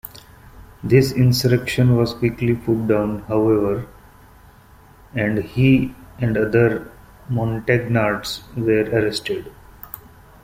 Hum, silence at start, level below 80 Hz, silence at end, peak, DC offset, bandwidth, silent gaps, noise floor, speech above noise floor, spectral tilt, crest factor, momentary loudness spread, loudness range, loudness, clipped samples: none; 0.15 s; -44 dBFS; 0.45 s; -2 dBFS; under 0.1%; 16.5 kHz; none; -47 dBFS; 29 dB; -7 dB/octave; 18 dB; 13 LU; 4 LU; -19 LUFS; under 0.1%